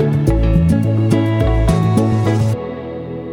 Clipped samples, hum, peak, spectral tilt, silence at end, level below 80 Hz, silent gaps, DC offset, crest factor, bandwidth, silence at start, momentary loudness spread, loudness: under 0.1%; none; -2 dBFS; -8 dB/octave; 0 s; -22 dBFS; none; under 0.1%; 14 dB; 12 kHz; 0 s; 12 LU; -15 LUFS